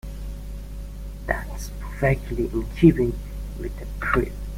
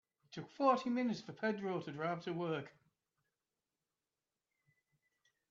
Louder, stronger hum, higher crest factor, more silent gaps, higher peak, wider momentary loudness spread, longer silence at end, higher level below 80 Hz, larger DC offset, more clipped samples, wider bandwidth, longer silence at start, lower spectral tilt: first, -24 LUFS vs -38 LUFS; first, 50 Hz at -30 dBFS vs none; about the same, 22 dB vs 22 dB; neither; first, -2 dBFS vs -20 dBFS; about the same, 19 LU vs 18 LU; second, 0 s vs 2.8 s; first, -32 dBFS vs -86 dBFS; neither; neither; first, 16.5 kHz vs 7.6 kHz; second, 0.05 s vs 0.3 s; first, -7.5 dB/octave vs -5 dB/octave